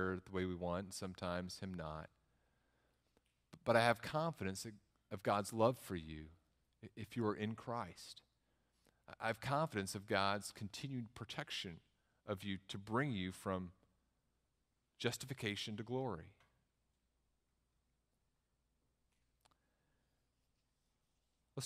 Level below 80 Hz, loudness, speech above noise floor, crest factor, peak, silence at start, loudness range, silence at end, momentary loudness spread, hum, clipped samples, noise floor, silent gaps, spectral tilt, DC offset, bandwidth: -72 dBFS; -42 LUFS; 43 dB; 28 dB; -18 dBFS; 0 s; 8 LU; 0 s; 17 LU; none; under 0.1%; -85 dBFS; none; -5 dB/octave; under 0.1%; 15.5 kHz